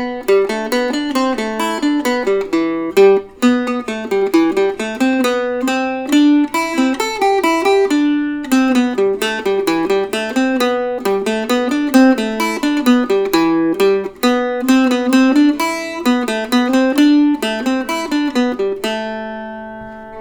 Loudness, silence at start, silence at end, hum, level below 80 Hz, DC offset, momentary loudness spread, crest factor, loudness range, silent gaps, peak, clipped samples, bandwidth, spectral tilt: -15 LUFS; 0 s; 0 s; none; -50 dBFS; under 0.1%; 7 LU; 14 dB; 2 LU; none; 0 dBFS; under 0.1%; over 20 kHz; -4 dB/octave